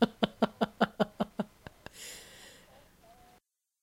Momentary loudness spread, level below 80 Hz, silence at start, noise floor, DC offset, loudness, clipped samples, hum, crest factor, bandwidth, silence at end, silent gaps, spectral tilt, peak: 20 LU; -64 dBFS; 0 s; -68 dBFS; under 0.1%; -34 LUFS; under 0.1%; none; 26 dB; 16.5 kHz; 1.65 s; none; -5.5 dB/octave; -8 dBFS